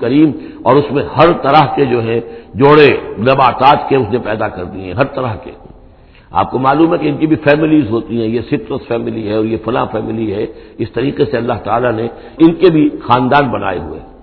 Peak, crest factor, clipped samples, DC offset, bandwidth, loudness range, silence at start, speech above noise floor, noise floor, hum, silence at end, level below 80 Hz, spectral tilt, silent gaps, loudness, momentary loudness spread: 0 dBFS; 12 dB; 0.4%; under 0.1%; 5.4 kHz; 6 LU; 0 s; 28 dB; -41 dBFS; none; 0.15 s; -40 dBFS; -9.5 dB/octave; none; -13 LUFS; 11 LU